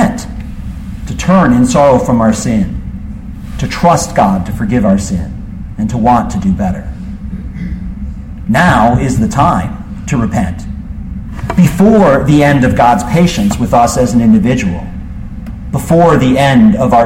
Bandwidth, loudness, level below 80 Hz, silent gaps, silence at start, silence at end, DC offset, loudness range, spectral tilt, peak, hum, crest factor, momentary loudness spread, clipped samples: 16 kHz; -10 LUFS; -24 dBFS; none; 0 s; 0 s; under 0.1%; 5 LU; -6.5 dB/octave; 0 dBFS; none; 10 dB; 17 LU; under 0.1%